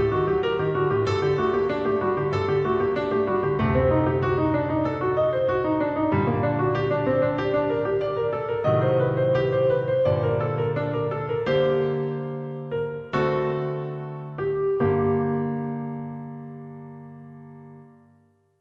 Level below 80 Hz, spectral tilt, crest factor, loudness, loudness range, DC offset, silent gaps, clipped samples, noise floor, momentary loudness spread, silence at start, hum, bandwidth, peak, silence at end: -48 dBFS; -8.5 dB/octave; 16 dB; -24 LUFS; 4 LU; under 0.1%; none; under 0.1%; -60 dBFS; 12 LU; 0 s; none; 6.8 kHz; -8 dBFS; 0.75 s